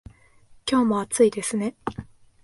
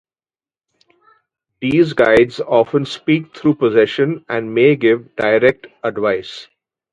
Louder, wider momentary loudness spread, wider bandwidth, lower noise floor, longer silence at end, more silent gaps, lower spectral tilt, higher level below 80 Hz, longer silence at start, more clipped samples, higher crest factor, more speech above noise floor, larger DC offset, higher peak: second, -24 LUFS vs -16 LUFS; first, 14 LU vs 11 LU; first, 11.5 kHz vs 9.4 kHz; second, -53 dBFS vs under -90 dBFS; about the same, 0.4 s vs 0.5 s; neither; second, -4.5 dB/octave vs -7 dB/octave; about the same, -54 dBFS vs -52 dBFS; second, 0.65 s vs 1.6 s; neither; about the same, 18 dB vs 16 dB; second, 31 dB vs over 75 dB; neither; second, -8 dBFS vs 0 dBFS